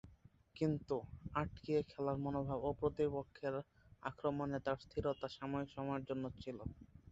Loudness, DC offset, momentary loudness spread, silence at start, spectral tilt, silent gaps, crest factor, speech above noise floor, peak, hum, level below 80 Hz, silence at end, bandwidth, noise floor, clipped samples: -42 LUFS; under 0.1%; 10 LU; 0.05 s; -6.5 dB/octave; none; 20 dB; 25 dB; -22 dBFS; none; -60 dBFS; 0 s; 7.8 kHz; -66 dBFS; under 0.1%